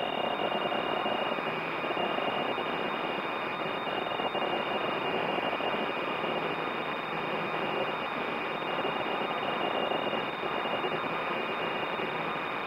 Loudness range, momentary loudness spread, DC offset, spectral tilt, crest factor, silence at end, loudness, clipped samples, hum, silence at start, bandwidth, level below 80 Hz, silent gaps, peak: 1 LU; 2 LU; under 0.1%; -5.5 dB/octave; 16 dB; 0 s; -31 LUFS; under 0.1%; none; 0 s; 16 kHz; -68 dBFS; none; -16 dBFS